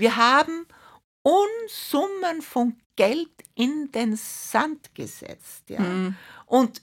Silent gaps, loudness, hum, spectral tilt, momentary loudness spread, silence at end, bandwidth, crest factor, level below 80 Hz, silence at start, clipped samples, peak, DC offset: 1.04-1.25 s, 2.86-2.90 s; -24 LUFS; none; -4.5 dB/octave; 17 LU; 0.05 s; 17 kHz; 20 dB; -70 dBFS; 0 s; under 0.1%; -6 dBFS; under 0.1%